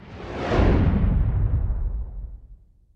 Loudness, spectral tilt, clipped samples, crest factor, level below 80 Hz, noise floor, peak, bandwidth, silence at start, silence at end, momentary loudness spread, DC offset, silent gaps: -23 LUFS; -9 dB/octave; under 0.1%; 14 dB; -26 dBFS; -49 dBFS; -8 dBFS; 6.6 kHz; 0 s; 0.4 s; 17 LU; under 0.1%; none